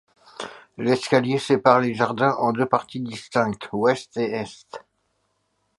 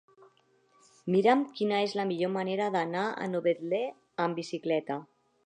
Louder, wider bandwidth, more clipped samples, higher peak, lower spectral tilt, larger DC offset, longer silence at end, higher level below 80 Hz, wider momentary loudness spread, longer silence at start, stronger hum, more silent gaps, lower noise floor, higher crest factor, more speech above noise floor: first, -22 LUFS vs -30 LUFS; first, 11.5 kHz vs 10 kHz; neither; first, -2 dBFS vs -10 dBFS; about the same, -6 dB/octave vs -6 dB/octave; neither; first, 1 s vs 0.4 s; first, -64 dBFS vs -84 dBFS; first, 18 LU vs 9 LU; second, 0.4 s vs 1.05 s; neither; neither; first, -71 dBFS vs -67 dBFS; about the same, 22 dB vs 20 dB; first, 49 dB vs 38 dB